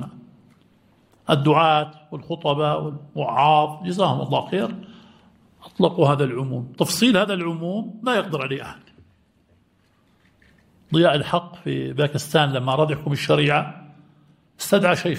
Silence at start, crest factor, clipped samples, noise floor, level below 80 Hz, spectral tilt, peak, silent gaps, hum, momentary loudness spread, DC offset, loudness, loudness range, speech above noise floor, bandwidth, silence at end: 0 s; 20 dB; under 0.1%; -61 dBFS; -60 dBFS; -5.5 dB/octave; -2 dBFS; none; none; 14 LU; under 0.1%; -21 LUFS; 5 LU; 41 dB; 16 kHz; 0 s